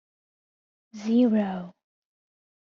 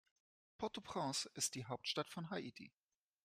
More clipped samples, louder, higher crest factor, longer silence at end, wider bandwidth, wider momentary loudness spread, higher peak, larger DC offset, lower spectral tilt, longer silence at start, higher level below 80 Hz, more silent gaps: neither; first, -24 LUFS vs -44 LUFS; about the same, 16 dB vs 20 dB; first, 1.05 s vs 0.55 s; second, 7 kHz vs 15.5 kHz; first, 16 LU vs 11 LU; first, -12 dBFS vs -26 dBFS; neither; first, -7 dB/octave vs -3 dB/octave; first, 0.95 s vs 0.6 s; first, -72 dBFS vs -80 dBFS; neither